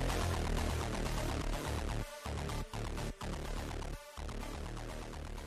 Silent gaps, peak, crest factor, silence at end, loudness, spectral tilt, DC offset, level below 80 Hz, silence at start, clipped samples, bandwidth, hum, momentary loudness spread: none; -22 dBFS; 16 dB; 0 s; -40 LUFS; -5 dB/octave; under 0.1%; -42 dBFS; 0 s; under 0.1%; 15 kHz; none; 9 LU